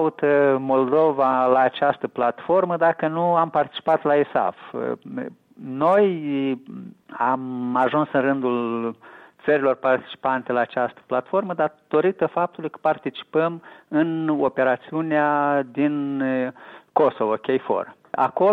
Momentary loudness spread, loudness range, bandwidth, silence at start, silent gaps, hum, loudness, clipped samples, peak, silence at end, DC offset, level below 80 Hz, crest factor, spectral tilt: 10 LU; 4 LU; 4.9 kHz; 0 s; none; none; -22 LUFS; under 0.1%; -4 dBFS; 0 s; under 0.1%; -70 dBFS; 18 dB; -8.5 dB/octave